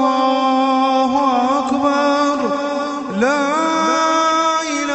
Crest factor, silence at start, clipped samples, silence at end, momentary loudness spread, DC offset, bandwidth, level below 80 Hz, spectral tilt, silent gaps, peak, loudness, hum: 14 dB; 0 s; under 0.1%; 0 s; 5 LU; under 0.1%; 8.4 kHz; -58 dBFS; -3.5 dB/octave; none; -2 dBFS; -16 LUFS; none